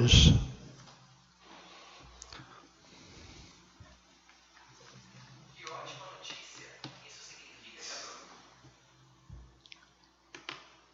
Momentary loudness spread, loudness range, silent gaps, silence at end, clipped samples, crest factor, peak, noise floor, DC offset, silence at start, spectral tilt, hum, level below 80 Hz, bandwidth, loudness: 13 LU; 8 LU; none; 2.85 s; under 0.1%; 26 dB; -8 dBFS; -65 dBFS; under 0.1%; 0 s; -4.5 dB/octave; none; -40 dBFS; 7.8 kHz; -31 LUFS